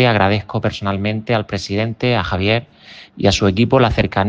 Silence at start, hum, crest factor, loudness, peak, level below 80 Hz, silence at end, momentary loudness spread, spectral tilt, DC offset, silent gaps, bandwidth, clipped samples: 0 s; none; 16 dB; -17 LUFS; 0 dBFS; -38 dBFS; 0 s; 7 LU; -6 dB/octave; under 0.1%; none; 9 kHz; under 0.1%